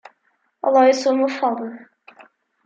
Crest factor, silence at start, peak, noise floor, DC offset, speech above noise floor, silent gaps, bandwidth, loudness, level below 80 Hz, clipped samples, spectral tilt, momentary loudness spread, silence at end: 16 dB; 0.65 s; -4 dBFS; -67 dBFS; under 0.1%; 49 dB; none; 7.8 kHz; -18 LUFS; -78 dBFS; under 0.1%; -3.5 dB/octave; 13 LU; 0.8 s